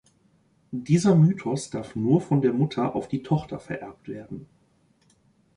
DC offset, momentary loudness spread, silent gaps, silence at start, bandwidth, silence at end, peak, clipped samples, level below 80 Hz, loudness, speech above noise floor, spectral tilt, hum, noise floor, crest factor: under 0.1%; 18 LU; none; 0.7 s; 11 kHz; 1.1 s; -8 dBFS; under 0.1%; -58 dBFS; -24 LUFS; 40 dB; -7.5 dB/octave; none; -64 dBFS; 18 dB